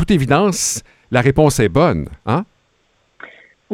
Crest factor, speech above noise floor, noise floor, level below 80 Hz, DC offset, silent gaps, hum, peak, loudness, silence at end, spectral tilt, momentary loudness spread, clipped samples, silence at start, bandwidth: 16 dB; 46 dB; -61 dBFS; -38 dBFS; under 0.1%; none; none; 0 dBFS; -16 LUFS; 0 s; -5 dB/octave; 9 LU; under 0.1%; 0 s; 17 kHz